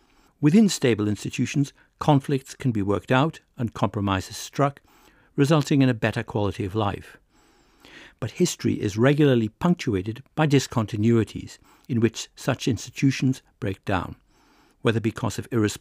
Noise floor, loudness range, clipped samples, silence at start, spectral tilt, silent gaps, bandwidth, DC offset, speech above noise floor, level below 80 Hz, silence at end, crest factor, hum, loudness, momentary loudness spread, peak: -59 dBFS; 4 LU; under 0.1%; 0.4 s; -6 dB/octave; none; 16 kHz; under 0.1%; 36 dB; -58 dBFS; 0.05 s; 18 dB; none; -24 LUFS; 11 LU; -6 dBFS